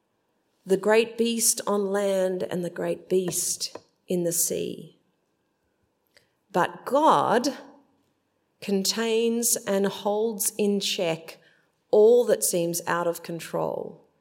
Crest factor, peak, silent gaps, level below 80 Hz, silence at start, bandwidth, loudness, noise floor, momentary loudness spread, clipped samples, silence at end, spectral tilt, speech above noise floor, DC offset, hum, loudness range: 20 dB; -6 dBFS; none; -76 dBFS; 0.65 s; 16.5 kHz; -24 LUFS; -73 dBFS; 11 LU; under 0.1%; 0.25 s; -3.5 dB/octave; 48 dB; under 0.1%; none; 5 LU